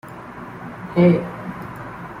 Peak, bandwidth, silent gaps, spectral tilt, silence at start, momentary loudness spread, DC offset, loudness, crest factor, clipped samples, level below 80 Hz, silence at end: -4 dBFS; 5.2 kHz; none; -9.5 dB/octave; 0.05 s; 20 LU; under 0.1%; -19 LUFS; 18 dB; under 0.1%; -52 dBFS; 0 s